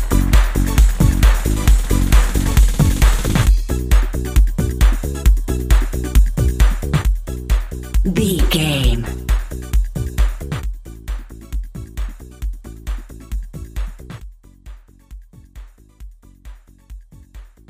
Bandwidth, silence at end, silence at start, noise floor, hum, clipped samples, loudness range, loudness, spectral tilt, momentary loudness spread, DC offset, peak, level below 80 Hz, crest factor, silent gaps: 16 kHz; 0.25 s; 0 s; -39 dBFS; none; under 0.1%; 17 LU; -18 LUFS; -5.5 dB/octave; 15 LU; under 0.1%; -2 dBFS; -18 dBFS; 16 dB; none